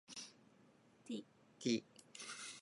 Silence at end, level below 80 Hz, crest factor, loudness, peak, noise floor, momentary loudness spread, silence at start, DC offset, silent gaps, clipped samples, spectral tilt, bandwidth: 0 s; under -90 dBFS; 24 dB; -46 LUFS; -24 dBFS; -69 dBFS; 19 LU; 0.1 s; under 0.1%; none; under 0.1%; -3.5 dB/octave; 11.5 kHz